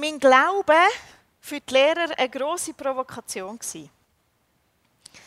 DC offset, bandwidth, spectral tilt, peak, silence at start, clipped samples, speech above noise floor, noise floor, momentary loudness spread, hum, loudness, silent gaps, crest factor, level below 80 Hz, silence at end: under 0.1%; 15.5 kHz; -1.5 dB/octave; -2 dBFS; 0 s; under 0.1%; 46 dB; -68 dBFS; 17 LU; none; -21 LUFS; none; 22 dB; -66 dBFS; 1.4 s